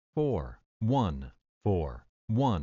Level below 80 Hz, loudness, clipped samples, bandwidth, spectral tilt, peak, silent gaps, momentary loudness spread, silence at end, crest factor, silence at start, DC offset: -46 dBFS; -31 LUFS; under 0.1%; 7.2 kHz; -8.5 dB/octave; -16 dBFS; 0.66-0.80 s, 1.49-1.61 s, 2.09-2.28 s; 16 LU; 0 s; 16 dB; 0.15 s; under 0.1%